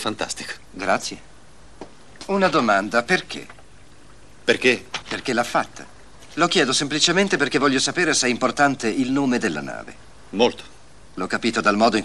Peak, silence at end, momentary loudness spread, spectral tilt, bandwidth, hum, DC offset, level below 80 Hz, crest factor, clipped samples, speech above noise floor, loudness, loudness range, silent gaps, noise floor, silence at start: -4 dBFS; 0 s; 16 LU; -3 dB/octave; 12.5 kHz; none; 0.6%; -54 dBFS; 20 dB; under 0.1%; 28 dB; -20 LUFS; 5 LU; none; -49 dBFS; 0 s